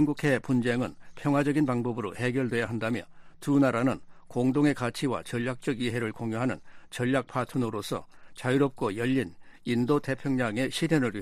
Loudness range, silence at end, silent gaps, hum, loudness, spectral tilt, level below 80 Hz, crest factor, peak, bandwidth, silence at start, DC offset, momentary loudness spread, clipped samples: 3 LU; 0 s; none; none; -29 LUFS; -6.5 dB/octave; -58 dBFS; 18 dB; -12 dBFS; 14 kHz; 0 s; under 0.1%; 10 LU; under 0.1%